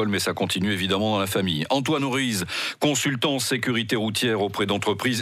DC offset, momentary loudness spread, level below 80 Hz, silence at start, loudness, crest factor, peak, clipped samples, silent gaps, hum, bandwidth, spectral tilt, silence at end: under 0.1%; 2 LU; -64 dBFS; 0 s; -23 LUFS; 14 dB; -10 dBFS; under 0.1%; none; none; 16 kHz; -4 dB/octave; 0 s